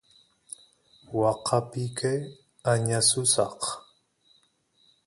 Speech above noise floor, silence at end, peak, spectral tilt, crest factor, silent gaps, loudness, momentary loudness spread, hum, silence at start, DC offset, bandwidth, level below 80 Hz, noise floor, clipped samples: 41 dB; 1.25 s; -6 dBFS; -3.5 dB/octave; 22 dB; none; -26 LUFS; 22 LU; none; 1.1 s; under 0.1%; 11.5 kHz; -64 dBFS; -67 dBFS; under 0.1%